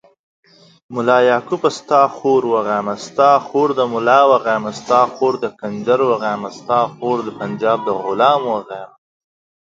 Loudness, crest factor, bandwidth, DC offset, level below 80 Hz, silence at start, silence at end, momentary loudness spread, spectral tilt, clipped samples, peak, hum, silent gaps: -16 LUFS; 16 dB; 7.8 kHz; under 0.1%; -64 dBFS; 0.9 s; 0.8 s; 10 LU; -5.5 dB/octave; under 0.1%; 0 dBFS; none; none